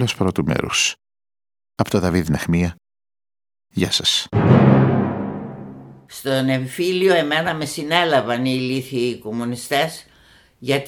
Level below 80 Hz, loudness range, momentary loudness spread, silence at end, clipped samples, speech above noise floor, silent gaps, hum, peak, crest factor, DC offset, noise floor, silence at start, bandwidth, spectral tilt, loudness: -46 dBFS; 4 LU; 15 LU; 0 s; under 0.1%; 33 dB; none; none; 0 dBFS; 20 dB; under 0.1%; -52 dBFS; 0 s; 18.5 kHz; -5 dB/octave; -19 LUFS